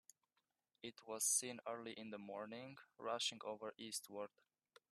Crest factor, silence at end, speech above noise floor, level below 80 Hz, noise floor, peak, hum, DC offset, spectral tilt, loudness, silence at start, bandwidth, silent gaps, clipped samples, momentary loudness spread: 24 dB; 0.65 s; 42 dB; under -90 dBFS; -89 dBFS; -26 dBFS; none; under 0.1%; -1 dB/octave; -45 LUFS; 0.85 s; 14 kHz; none; under 0.1%; 17 LU